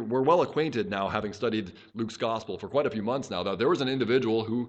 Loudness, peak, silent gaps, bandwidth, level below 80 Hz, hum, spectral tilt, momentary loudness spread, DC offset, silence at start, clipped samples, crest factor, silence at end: -28 LUFS; -10 dBFS; none; 8.6 kHz; -62 dBFS; none; -6 dB/octave; 9 LU; under 0.1%; 0 s; under 0.1%; 18 dB; 0 s